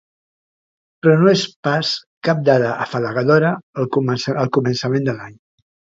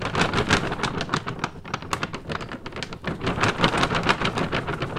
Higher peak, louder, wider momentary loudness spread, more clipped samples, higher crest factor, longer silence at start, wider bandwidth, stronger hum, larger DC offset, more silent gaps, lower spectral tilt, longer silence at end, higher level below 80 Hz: about the same, 0 dBFS vs 0 dBFS; first, -18 LUFS vs -25 LUFS; second, 8 LU vs 11 LU; neither; second, 18 dB vs 24 dB; first, 1.05 s vs 0 s; second, 7.8 kHz vs 15.5 kHz; neither; neither; first, 1.56-1.63 s, 2.07-2.21 s, 3.63-3.73 s vs none; first, -6 dB/octave vs -4.5 dB/octave; first, 0.6 s vs 0 s; second, -60 dBFS vs -42 dBFS